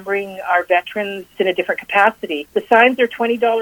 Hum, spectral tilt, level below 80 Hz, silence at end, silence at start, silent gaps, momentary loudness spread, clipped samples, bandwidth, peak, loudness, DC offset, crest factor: none; -4.5 dB/octave; -62 dBFS; 0 s; 0 s; none; 11 LU; under 0.1%; 19 kHz; 0 dBFS; -17 LUFS; under 0.1%; 16 dB